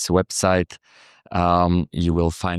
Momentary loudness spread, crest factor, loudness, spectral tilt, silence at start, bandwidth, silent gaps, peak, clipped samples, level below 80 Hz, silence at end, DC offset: 6 LU; 18 dB; -21 LUFS; -5.5 dB/octave; 0 s; 13.5 kHz; none; -4 dBFS; under 0.1%; -38 dBFS; 0 s; under 0.1%